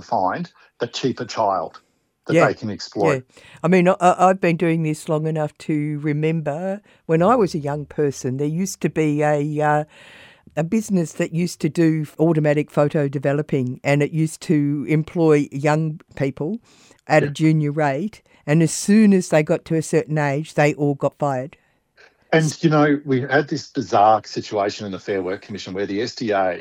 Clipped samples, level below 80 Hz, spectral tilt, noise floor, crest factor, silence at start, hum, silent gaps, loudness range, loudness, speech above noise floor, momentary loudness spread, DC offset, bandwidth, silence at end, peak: under 0.1%; -60 dBFS; -6.5 dB/octave; -54 dBFS; 18 dB; 0 s; none; none; 3 LU; -20 LUFS; 35 dB; 11 LU; under 0.1%; 16 kHz; 0 s; -2 dBFS